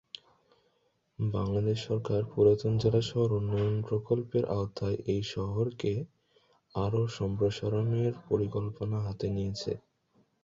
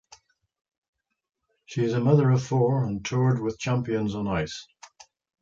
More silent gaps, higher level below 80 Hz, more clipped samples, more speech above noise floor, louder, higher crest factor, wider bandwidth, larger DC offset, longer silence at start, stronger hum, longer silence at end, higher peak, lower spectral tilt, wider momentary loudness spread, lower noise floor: neither; about the same, -54 dBFS vs -54 dBFS; neither; first, 44 dB vs 33 dB; second, -31 LUFS vs -25 LUFS; about the same, 18 dB vs 18 dB; about the same, 7.6 kHz vs 7.6 kHz; neither; second, 1.2 s vs 1.7 s; neither; about the same, 0.65 s vs 0.55 s; second, -12 dBFS vs -8 dBFS; about the same, -7.5 dB/octave vs -7 dB/octave; about the same, 8 LU vs 9 LU; first, -74 dBFS vs -57 dBFS